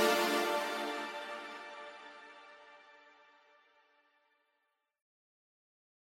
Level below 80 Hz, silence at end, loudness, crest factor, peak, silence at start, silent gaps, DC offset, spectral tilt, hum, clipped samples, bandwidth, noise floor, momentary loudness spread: -90 dBFS; 3 s; -36 LUFS; 24 dB; -16 dBFS; 0 s; none; under 0.1%; -2 dB/octave; none; under 0.1%; 16 kHz; -82 dBFS; 25 LU